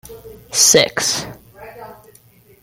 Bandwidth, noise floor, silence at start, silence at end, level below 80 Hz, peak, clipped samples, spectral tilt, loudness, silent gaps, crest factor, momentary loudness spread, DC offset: 17 kHz; -49 dBFS; 0.1 s; 0.7 s; -52 dBFS; 0 dBFS; under 0.1%; -1 dB/octave; -13 LUFS; none; 20 dB; 25 LU; under 0.1%